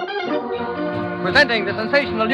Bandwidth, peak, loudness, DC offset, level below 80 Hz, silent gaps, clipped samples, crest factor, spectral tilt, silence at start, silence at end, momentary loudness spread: 11.5 kHz; 0 dBFS; -19 LUFS; under 0.1%; -50 dBFS; none; under 0.1%; 20 dB; -5.5 dB/octave; 0 s; 0 s; 9 LU